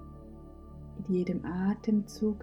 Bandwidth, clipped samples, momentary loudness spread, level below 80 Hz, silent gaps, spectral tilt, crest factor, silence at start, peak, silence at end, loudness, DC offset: 12.5 kHz; under 0.1%; 20 LU; -52 dBFS; none; -8 dB/octave; 14 dB; 0 s; -18 dBFS; 0 s; -32 LUFS; under 0.1%